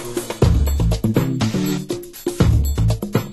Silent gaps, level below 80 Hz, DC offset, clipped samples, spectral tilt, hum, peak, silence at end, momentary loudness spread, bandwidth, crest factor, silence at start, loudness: none; -24 dBFS; under 0.1%; under 0.1%; -6.5 dB/octave; none; -2 dBFS; 0 s; 9 LU; 12.5 kHz; 16 dB; 0 s; -19 LUFS